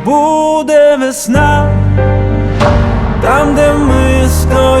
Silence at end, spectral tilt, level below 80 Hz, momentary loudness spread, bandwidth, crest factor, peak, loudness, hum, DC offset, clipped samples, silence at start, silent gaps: 0 s; -6 dB/octave; -18 dBFS; 4 LU; 15 kHz; 8 dB; 0 dBFS; -10 LUFS; none; under 0.1%; under 0.1%; 0 s; none